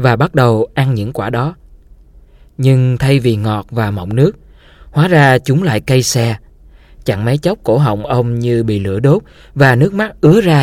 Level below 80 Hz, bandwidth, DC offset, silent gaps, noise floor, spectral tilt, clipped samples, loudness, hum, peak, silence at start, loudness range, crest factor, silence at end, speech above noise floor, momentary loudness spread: -38 dBFS; 15.5 kHz; under 0.1%; none; -42 dBFS; -6.5 dB/octave; under 0.1%; -13 LUFS; none; 0 dBFS; 0 s; 3 LU; 12 dB; 0 s; 30 dB; 8 LU